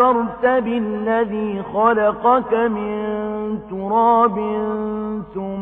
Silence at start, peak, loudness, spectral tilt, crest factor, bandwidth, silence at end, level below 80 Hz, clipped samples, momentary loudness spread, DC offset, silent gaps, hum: 0 s; -4 dBFS; -19 LUFS; -9.5 dB/octave; 16 dB; 3.9 kHz; 0 s; -50 dBFS; under 0.1%; 10 LU; under 0.1%; none; none